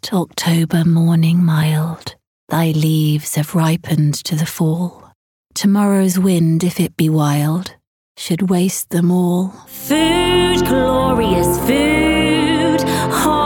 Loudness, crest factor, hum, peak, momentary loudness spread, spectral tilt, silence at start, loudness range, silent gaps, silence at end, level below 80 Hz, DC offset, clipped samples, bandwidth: -15 LUFS; 12 dB; none; -4 dBFS; 8 LU; -5.5 dB/octave; 0.05 s; 3 LU; 2.27-2.47 s, 5.15-5.45 s, 7.87-8.15 s; 0 s; -38 dBFS; under 0.1%; under 0.1%; 18 kHz